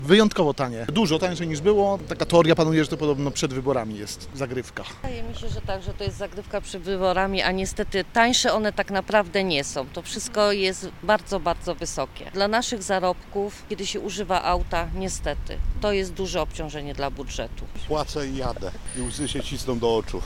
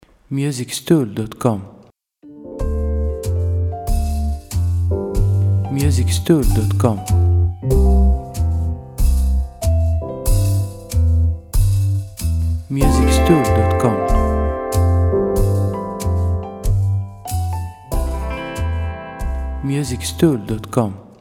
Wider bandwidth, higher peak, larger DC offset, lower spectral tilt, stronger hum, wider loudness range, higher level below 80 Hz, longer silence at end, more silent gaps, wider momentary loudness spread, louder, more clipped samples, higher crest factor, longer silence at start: about the same, 16.5 kHz vs 16.5 kHz; about the same, -2 dBFS vs 0 dBFS; neither; second, -4.5 dB/octave vs -7 dB/octave; neither; about the same, 8 LU vs 6 LU; second, -36 dBFS vs -22 dBFS; second, 0 s vs 0.15 s; neither; first, 12 LU vs 9 LU; second, -25 LUFS vs -19 LUFS; neither; first, 22 dB vs 16 dB; second, 0 s vs 0.3 s